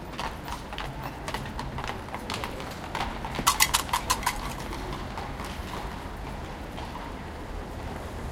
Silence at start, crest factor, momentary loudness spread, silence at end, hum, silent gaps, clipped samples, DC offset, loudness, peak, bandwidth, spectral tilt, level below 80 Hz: 0 s; 30 dB; 12 LU; 0 s; none; none; under 0.1%; under 0.1%; -31 LUFS; -2 dBFS; 17 kHz; -2.5 dB/octave; -40 dBFS